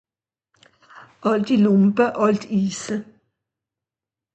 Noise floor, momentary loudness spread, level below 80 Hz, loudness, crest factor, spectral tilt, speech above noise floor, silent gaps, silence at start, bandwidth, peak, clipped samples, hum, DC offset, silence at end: under -90 dBFS; 12 LU; -64 dBFS; -20 LUFS; 18 dB; -6.5 dB/octave; over 71 dB; none; 0.95 s; 8.6 kHz; -4 dBFS; under 0.1%; none; under 0.1%; 1.3 s